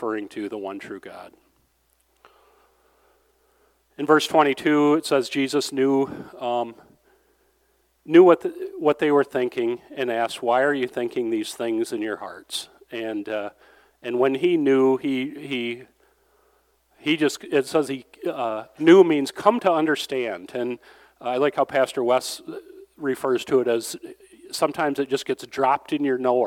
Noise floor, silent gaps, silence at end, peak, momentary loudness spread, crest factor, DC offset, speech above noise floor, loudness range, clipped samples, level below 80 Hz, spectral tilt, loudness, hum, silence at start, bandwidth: -66 dBFS; none; 0 s; -2 dBFS; 14 LU; 22 dB; under 0.1%; 44 dB; 6 LU; under 0.1%; -70 dBFS; -4.5 dB/octave; -22 LUFS; none; 0 s; 16 kHz